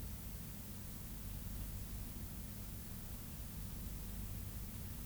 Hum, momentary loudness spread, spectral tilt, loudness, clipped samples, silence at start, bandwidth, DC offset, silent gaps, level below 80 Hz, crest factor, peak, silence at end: none; 1 LU; -4.5 dB/octave; -47 LUFS; under 0.1%; 0 s; over 20 kHz; under 0.1%; none; -50 dBFS; 14 dB; -34 dBFS; 0 s